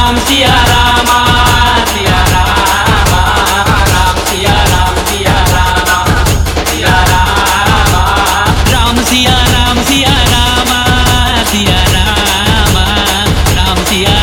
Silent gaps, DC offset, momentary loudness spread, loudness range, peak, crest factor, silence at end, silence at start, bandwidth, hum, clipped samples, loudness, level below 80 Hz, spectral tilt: none; under 0.1%; 3 LU; 1 LU; 0 dBFS; 8 dB; 0 s; 0 s; 18 kHz; none; 0.4%; -8 LUFS; -16 dBFS; -3.5 dB/octave